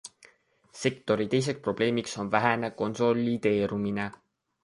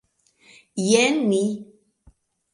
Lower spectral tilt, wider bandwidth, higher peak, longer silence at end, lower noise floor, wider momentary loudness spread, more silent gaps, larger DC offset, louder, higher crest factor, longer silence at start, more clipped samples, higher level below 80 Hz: first, -5.5 dB/octave vs -4 dB/octave; about the same, 11.5 kHz vs 11.5 kHz; second, -8 dBFS vs -4 dBFS; second, 0.55 s vs 0.9 s; first, -62 dBFS vs -58 dBFS; second, 6 LU vs 16 LU; neither; neither; second, -28 LUFS vs -20 LUFS; about the same, 22 dB vs 20 dB; second, 0.05 s vs 0.75 s; neither; about the same, -62 dBFS vs -64 dBFS